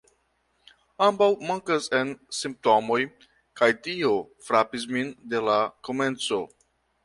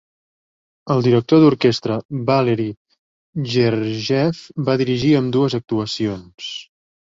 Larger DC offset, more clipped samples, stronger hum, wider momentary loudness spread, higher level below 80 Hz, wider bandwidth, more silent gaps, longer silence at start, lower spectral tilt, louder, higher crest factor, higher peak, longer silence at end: neither; neither; neither; second, 8 LU vs 14 LU; second, -68 dBFS vs -54 dBFS; first, 11.5 kHz vs 7.8 kHz; second, none vs 2.05-2.09 s, 2.77-2.85 s, 2.99-3.33 s; first, 1 s vs 0.85 s; second, -4 dB/octave vs -7 dB/octave; second, -25 LUFS vs -18 LUFS; about the same, 20 dB vs 18 dB; second, -6 dBFS vs -2 dBFS; about the same, 0.6 s vs 0.5 s